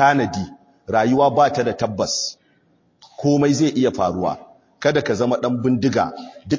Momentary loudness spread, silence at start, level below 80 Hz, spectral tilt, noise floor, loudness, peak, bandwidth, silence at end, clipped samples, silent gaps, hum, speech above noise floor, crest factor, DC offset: 11 LU; 0 s; -50 dBFS; -5 dB/octave; -60 dBFS; -19 LUFS; -2 dBFS; 7.6 kHz; 0 s; under 0.1%; none; none; 42 dB; 18 dB; under 0.1%